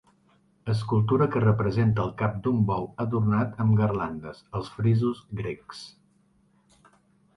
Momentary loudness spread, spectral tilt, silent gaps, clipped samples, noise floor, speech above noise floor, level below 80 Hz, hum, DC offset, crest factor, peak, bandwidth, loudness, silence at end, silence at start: 14 LU; -9 dB/octave; none; under 0.1%; -64 dBFS; 39 dB; -52 dBFS; none; under 0.1%; 18 dB; -10 dBFS; 10.5 kHz; -26 LUFS; 1.5 s; 0.65 s